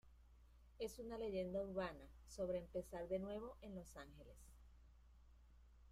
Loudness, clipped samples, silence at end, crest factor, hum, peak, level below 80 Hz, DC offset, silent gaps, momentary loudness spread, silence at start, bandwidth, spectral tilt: -49 LUFS; under 0.1%; 0 s; 18 dB; none; -34 dBFS; -64 dBFS; under 0.1%; none; 19 LU; 0.05 s; 15.5 kHz; -6 dB/octave